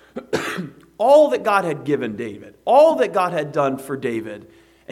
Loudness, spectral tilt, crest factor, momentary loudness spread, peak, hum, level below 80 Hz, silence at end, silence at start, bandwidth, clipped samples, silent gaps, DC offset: -19 LUFS; -5.5 dB/octave; 18 dB; 17 LU; -2 dBFS; none; -64 dBFS; 0 s; 0.15 s; 14 kHz; under 0.1%; none; under 0.1%